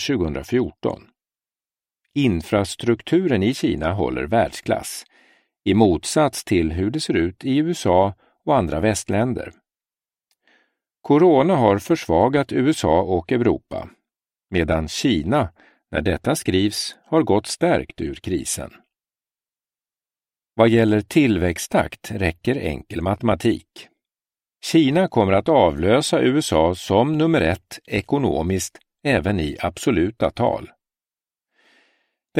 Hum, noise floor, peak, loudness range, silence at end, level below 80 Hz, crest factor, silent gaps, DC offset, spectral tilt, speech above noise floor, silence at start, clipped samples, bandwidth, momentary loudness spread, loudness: none; under -90 dBFS; 0 dBFS; 5 LU; 0 s; -42 dBFS; 20 dB; none; under 0.1%; -5.5 dB/octave; over 71 dB; 0 s; under 0.1%; 16 kHz; 11 LU; -20 LUFS